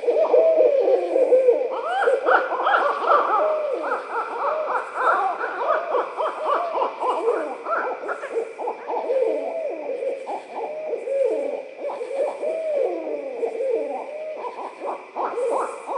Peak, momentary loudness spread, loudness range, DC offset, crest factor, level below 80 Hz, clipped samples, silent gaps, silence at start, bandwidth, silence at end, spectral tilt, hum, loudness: -4 dBFS; 13 LU; 8 LU; under 0.1%; 20 dB; under -90 dBFS; under 0.1%; none; 0 s; 10.5 kHz; 0 s; -3 dB/octave; none; -23 LUFS